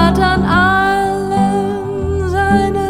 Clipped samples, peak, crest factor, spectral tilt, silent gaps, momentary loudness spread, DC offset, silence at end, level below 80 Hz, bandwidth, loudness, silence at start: under 0.1%; 0 dBFS; 14 dB; -6.5 dB/octave; none; 7 LU; under 0.1%; 0 s; -28 dBFS; 15.5 kHz; -14 LUFS; 0 s